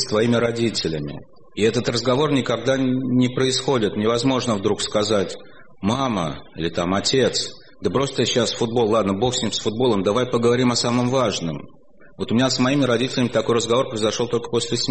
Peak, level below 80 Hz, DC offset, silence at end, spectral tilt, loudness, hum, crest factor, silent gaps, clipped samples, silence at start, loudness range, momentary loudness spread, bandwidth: -6 dBFS; -50 dBFS; 0.7%; 0 s; -4.5 dB/octave; -21 LUFS; none; 14 dB; none; under 0.1%; 0 s; 2 LU; 8 LU; 8.8 kHz